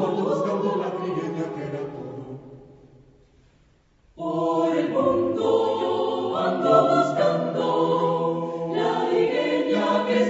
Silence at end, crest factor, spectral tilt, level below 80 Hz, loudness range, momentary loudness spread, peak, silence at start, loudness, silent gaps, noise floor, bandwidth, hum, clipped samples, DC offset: 0 s; 20 dB; -6.5 dB/octave; -64 dBFS; 11 LU; 11 LU; -4 dBFS; 0 s; -23 LUFS; none; -59 dBFS; 8 kHz; none; under 0.1%; under 0.1%